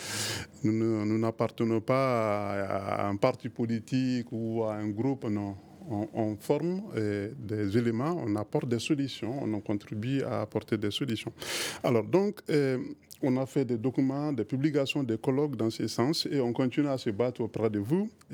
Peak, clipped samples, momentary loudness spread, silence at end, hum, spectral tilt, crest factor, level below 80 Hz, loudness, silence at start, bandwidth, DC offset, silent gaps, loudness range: -10 dBFS; under 0.1%; 6 LU; 0 s; none; -6 dB/octave; 20 dB; -68 dBFS; -30 LUFS; 0 s; 20 kHz; under 0.1%; none; 3 LU